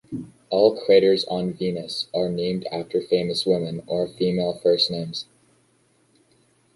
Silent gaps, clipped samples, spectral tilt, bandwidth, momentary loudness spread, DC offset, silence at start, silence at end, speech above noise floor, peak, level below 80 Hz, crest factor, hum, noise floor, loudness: none; under 0.1%; -6 dB/octave; 11.5 kHz; 12 LU; under 0.1%; 0.1 s; 1.5 s; 41 dB; -4 dBFS; -60 dBFS; 20 dB; none; -63 dBFS; -22 LUFS